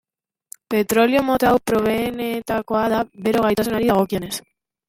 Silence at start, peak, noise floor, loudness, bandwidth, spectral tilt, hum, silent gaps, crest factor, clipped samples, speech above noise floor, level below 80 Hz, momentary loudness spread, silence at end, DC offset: 0.7 s; -2 dBFS; -46 dBFS; -20 LUFS; 16.5 kHz; -5 dB/octave; none; none; 18 dB; under 0.1%; 28 dB; -48 dBFS; 8 LU; 0.5 s; under 0.1%